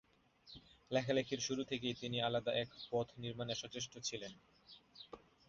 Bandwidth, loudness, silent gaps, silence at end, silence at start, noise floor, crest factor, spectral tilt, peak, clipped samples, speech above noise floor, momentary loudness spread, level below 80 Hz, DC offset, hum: 7.4 kHz; -40 LUFS; none; 0.3 s; 0.45 s; -65 dBFS; 20 dB; -3.5 dB/octave; -22 dBFS; under 0.1%; 24 dB; 21 LU; -72 dBFS; under 0.1%; none